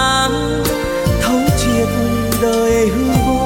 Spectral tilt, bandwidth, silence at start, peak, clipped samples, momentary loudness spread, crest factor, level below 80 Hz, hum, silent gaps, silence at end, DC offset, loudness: -5 dB/octave; 17 kHz; 0 s; -2 dBFS; under 0.1%; 3 LU; 12 dB; -26 dBFS; none; none; 0 s; under 0.1%; -15 LUFS